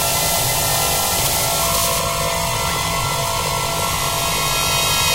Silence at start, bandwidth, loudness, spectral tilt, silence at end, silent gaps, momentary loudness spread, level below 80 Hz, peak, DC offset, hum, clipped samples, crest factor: 0 s; 16 kHz; -17 LUFS; -1.5 dB/octave; 0 s; none; 3 LU; -34 dBFS; -2 dBFS; under 0.1%; none; under 0.1%; 16 dB